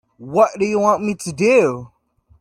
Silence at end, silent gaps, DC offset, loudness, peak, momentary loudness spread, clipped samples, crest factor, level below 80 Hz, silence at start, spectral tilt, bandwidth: 0.55 s; none; under 0.1%; -17 LUFS; -2 dBFS; 9 LU; under 0.1%; 16 dB; -58 dBFS; 0.2 s; -5.5 dB/octave; 13.5 kHz